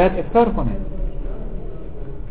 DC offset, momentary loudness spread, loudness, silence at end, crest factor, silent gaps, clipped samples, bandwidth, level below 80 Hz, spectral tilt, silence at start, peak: 4%; 18 LU; -22 LUFS; 0 s; 18 dB; none; under 0.1%; 4 kHz; -28 dBFS; -11.5 dB/octave; 0 s; -4 dBFS